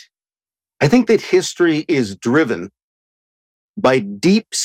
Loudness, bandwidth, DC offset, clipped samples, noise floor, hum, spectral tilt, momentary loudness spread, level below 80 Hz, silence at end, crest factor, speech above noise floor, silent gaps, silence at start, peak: -16 LUFS; 15 kHz; under 0.1%; under 0.1%; under -90 dBFS; none; -5 dB/octave; 7 LU; -56 dBFS; 0 s; 14 dB; over 75 dB; 2.82-3.74 s; 0.8 s; -4 dBFS